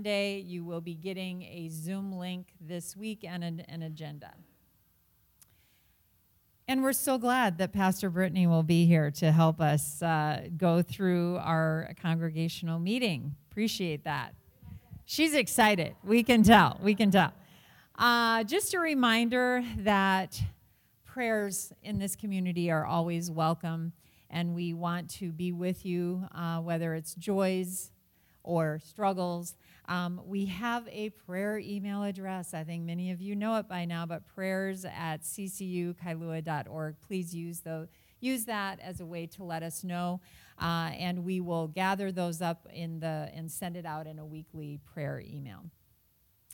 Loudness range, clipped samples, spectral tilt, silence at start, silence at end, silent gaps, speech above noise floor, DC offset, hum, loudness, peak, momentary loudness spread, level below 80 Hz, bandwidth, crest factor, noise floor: 13 LU; under 0.1%; -5.5 dB/octave; 0 s; 0 s; none; 38 dB; under 0.1%; none; -31 LUFS; -6 dBFS; 16 LU; -60 dBFS; 17.5 kHz; 24 dB; -69 dBFS